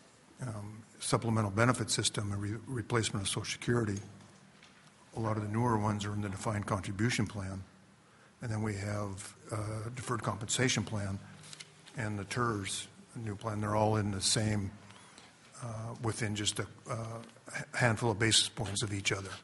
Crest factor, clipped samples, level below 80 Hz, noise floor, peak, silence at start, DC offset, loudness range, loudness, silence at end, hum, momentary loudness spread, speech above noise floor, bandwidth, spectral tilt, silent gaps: 24 dB; under 0.1%; -62 dBFS; -61 dBFS; -10 dBFS; 0.4 s; under 0.1%; 5 LU; -34 LUFS; 0 s; none; 16 LU; 27 dB; 11.5 kHz; -4 dB/octave; none